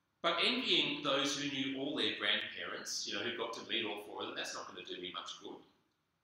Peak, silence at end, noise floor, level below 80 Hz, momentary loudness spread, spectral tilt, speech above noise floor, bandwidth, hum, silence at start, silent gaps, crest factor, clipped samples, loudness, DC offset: -18 dBFS; 0.6 s; -78 dBFS; -82 dBFS; 14 LU; -2 dB/octave; 40 dB; 16 kHz; none; 0.25 s; none; 20 dB; under 0.1%; -36 LUFS; under 0.1%